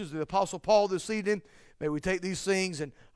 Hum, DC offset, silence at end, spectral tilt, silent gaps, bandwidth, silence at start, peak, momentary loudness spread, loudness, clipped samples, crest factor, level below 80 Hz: none; under 0.1%; 0.25 s; -4.5 dB/octave; none; 11 kHz; 0 s; -12 dBFS; 9 LU; -30 LUFS; under 0.1%; 18 dB; -56 dBFS